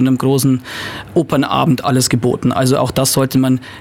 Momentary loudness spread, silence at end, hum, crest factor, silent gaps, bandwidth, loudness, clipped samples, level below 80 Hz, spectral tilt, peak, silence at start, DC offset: 5 LU; 0 s; none; 12 dB; none; 16.5 kHz; -15 LUFS; under 0.1%; -44 dBFS; -5 dB/octave; -2 dBFS; 0 s; under 0.1%